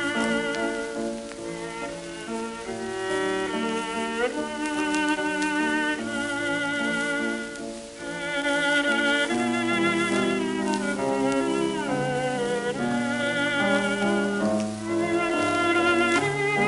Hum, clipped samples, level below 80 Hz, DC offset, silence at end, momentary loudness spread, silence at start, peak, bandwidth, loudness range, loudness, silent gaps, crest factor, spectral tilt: none; under 0.1%; -56 dBFS; under 0.1%; 0 s; 11 LU; 0 s; -6 dBFS; 11.5 kHz; 5 LU; -25 LUFS; none; 20 dB; -4 dB/octave